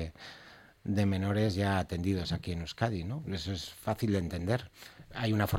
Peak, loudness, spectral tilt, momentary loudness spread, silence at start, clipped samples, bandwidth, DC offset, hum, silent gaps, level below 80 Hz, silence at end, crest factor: -14 dBFS; -33 LUFS; -6.5 dB/octave; 15 LU; 0 s; under 0.1%; 16.5 kHz; under 0.1%; none; none; -52 dBFS; 0 s; 20 dB